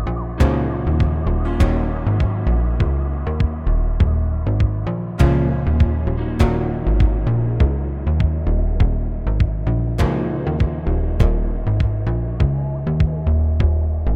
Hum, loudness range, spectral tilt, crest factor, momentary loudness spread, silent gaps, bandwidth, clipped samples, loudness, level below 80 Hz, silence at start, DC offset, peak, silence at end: none; 2 LU; -9 dB/octave; 16 dB; 4 LU; none; 7.6 kHz; under 0.1%; -20 LUFS; -20 dBFS; 0 s; under 0.1%; -2 dBFS; 0 s